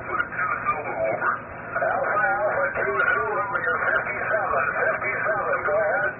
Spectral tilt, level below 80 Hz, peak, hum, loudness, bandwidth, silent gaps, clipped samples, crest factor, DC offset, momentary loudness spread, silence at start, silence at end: 2 dB/octave; -54 dBFS; -8 dBFS; none; -23 LUFS; 3.3 kHz; none; under 0.1%; 16 dB; under 0.1%; 4 LU; 0 s; 0 s